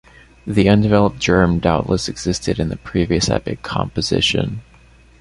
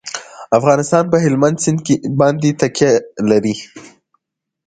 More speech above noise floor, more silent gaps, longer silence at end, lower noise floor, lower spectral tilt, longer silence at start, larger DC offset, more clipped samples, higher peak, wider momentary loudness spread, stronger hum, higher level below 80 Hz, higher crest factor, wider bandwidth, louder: second, 30 dB vs 61 dB; neither; second, 0.6 s vs 0.8 s; second, -47 dBFS vs -75 dBFS; about the same, -5.5 dB/octave vs -5.5 dB/octave; first, 0.45 s vs 0.05 s; neither; neither; about the same, 0 dBFS vs 0 dBFS; about the same, 9 LU vs 11 LU; neither; first, -34 dBFS vs -54 dBFS; about the same, 16 dB vs 16 dB; first, 11.5 kHz vs 9.4 kHz; second, -18 LUFS vs -15 LUFS